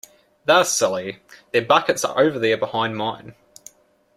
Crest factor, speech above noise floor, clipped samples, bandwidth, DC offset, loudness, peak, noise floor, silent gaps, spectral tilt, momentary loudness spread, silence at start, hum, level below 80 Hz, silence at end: 20 dB; 29 dB; under 0.1%; 16 kHz; under 0.1%; -20 LUFS; 0 dBFS; -49 dBFS; none; -3 dB/octave; 12 LU; 0.45 s; none; -64 dBFS; 0.85 s